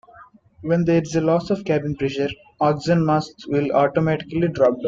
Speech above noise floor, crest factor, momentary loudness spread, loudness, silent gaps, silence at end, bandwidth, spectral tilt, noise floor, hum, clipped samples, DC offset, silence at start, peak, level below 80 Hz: 28 dB; 16 dB; 6 LU; -21 LUFS; none; 0 s; 7.6 kHz; -7.5 dB/octave; -48 dBFS; none; under 0.1%; under 0.1%; 0.15 s; -6 dBFS; -52 dBFS